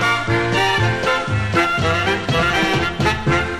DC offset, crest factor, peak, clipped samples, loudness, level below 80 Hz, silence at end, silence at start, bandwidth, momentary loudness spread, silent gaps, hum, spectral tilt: under 0.1%; 12 dB; -6 dBFS; under 0.1%; -17 LUFS; -36 dBFS; 0 s; 0 s; 14.5 kHz; 3 LU; none; none; -5 dB/octave